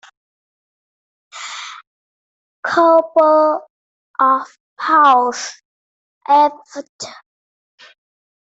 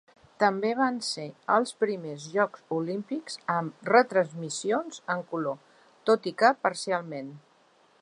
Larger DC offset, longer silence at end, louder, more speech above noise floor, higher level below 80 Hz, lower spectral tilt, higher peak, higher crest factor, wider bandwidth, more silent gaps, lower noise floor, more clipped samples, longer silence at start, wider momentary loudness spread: neither; first, 1.35 s vs 0.65 s; first, -14 LUFS vs -28 LUFS; first, over 76 dB vs 35 dB; first, -72 dBFS vs -80 dBFS; second, -2.5 dB/octave vs -4.5 dB/octave; first, -2 dBFS vs -6 dBFS; second, 16 dB vs 22 dB; second, 8 kHz vs 11 kHz; first, 1.87-2.63 s, 3.70-4.14 s, 4.60-4.76 s, 5.65-6.21 s, 6.89-6.99 s vs none; first, under -90 dBFS vs -62 dBFS; neither; first, 1.35 s vs 0.4 s; first, 20 LU vs 11 LU